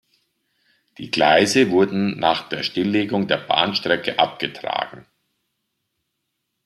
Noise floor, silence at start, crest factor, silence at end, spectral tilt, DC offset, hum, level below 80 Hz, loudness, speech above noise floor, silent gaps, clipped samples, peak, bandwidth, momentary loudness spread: -76 dBFS; 1 s; 20 dB; 1.65 s; -4 dB/octave; under 0.1%; none; -62 dBFS; -19 LUFS; 57 dB; none; under 0.1%; -2 dBFS; 13.5 kHz; 11 LU